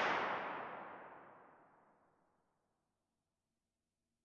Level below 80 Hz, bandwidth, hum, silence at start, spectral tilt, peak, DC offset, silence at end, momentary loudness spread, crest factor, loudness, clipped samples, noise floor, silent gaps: -86 dBFS; 8.2 kHz; none; 0 s; -4 dB/octave; -24 dBFS; under 0.1%; 2.6 s; 23 LU; 22 dB; -42 LUFS; under 0.1%; under -90 dBFS; none